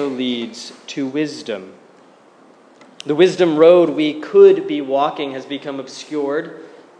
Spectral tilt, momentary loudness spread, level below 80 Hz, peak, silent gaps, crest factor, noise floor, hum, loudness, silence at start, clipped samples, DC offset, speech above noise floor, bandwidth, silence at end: -5.5 dB/octave; 19 LU; -76 dBFS; 0 dBFS; none; 16 dB; -48 dBFS; none; -16 LUFS; 0 s; under 0.1%; under 0.1%; 32 dB; 9.6 kHz; 0.35 s